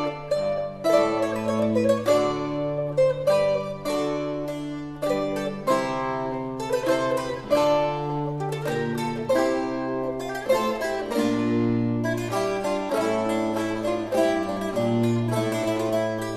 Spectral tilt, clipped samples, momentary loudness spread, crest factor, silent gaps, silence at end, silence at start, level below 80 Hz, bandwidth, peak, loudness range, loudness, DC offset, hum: -6 dB/octave; under 0.1%; 7 LU; 18 dB; none; 0 s; 0 s; -52 dBFS; 14 kHz; -6 dBFS; 3 LU; -25 LUFS; under 0.1%; none